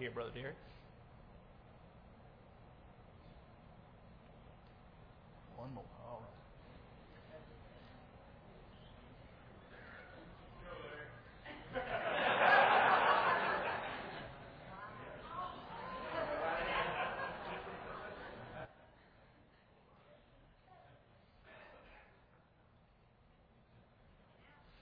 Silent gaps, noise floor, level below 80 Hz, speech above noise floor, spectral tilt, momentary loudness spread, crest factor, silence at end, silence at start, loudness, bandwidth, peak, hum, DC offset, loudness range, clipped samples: none; -68 dBFS; -66 dBFS; 20 dB; -1.5 dB/octave; 29 LU; 26 dB; 0.05 s; 0 s; -37 LUFS; 5.2 kHz; -16 dBFS; none; under 0.1%; 27 LU; under 0.1%